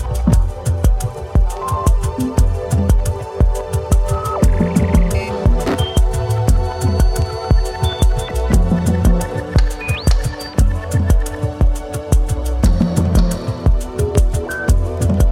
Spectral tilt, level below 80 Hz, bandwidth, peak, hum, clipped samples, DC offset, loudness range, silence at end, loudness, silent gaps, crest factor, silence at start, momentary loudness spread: -6.5 dB/octave; -16 dBFS; 15.5 kHz; 0 dBFS; none; under 0.1%; under 0.1%; 1 LU; 0 s; -17 LUFS; none; 14 dB; 0 s; 4 LU